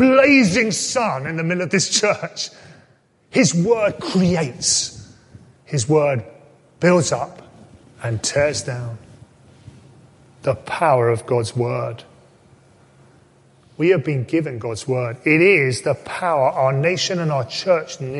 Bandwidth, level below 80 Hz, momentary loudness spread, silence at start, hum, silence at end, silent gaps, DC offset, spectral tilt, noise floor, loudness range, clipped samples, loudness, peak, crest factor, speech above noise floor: 11.5 kHz; -52 dBFS; 12 LU; 0 s; none; 0 s; none; under 0.1%; -4.5 dB/octave; -56 dBFS; 6 LU; under 0.1%; -19 LUFS; 0 dBFS; 18 dB; 38 dB